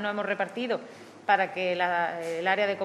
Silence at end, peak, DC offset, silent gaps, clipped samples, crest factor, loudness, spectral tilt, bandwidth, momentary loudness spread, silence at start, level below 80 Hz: 0 s; -8 dBFS; under 0.1%; none; under 0.1%; 20 dB; -28 LUFS; -4.5 dB/octave; 13 kHz; 8 LU; 0 s; -88 dBFS